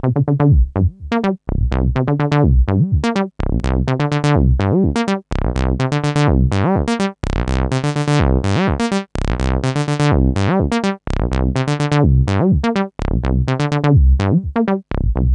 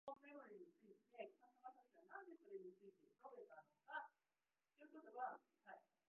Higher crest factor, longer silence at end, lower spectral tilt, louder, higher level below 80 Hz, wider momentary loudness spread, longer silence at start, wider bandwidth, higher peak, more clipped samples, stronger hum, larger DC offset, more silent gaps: second, 14 dB vs 22 dB; second, 0 s vs 0.3 s; first, -7.5 dB/octave vs 2 dB/octave; first, -17 LUFS vs -60 LUFS; first, -22 dBFS vs under -90 dBFS; second, 6 LU vs 14 LU; about the same, 0.05 s vs 0.05 s; first, 10.5 kHz vs 3.5 kHz; first, 0 dBFS vs -38 dBFS; neither; neither; neither; neither